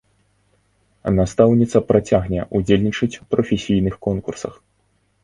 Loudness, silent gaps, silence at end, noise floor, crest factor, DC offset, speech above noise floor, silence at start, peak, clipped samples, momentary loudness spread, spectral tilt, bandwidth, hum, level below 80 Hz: -19 LUFS; none; 0.7 s; -64 dBFS; 18 dB; under 0.1%; 46 dB; 1.05 s; 0 dBFS; under 0.1%; 12 LU; -7 dB/octave; 11.5 kHz; 50 Hz at -40 dBFS; -40 dBFS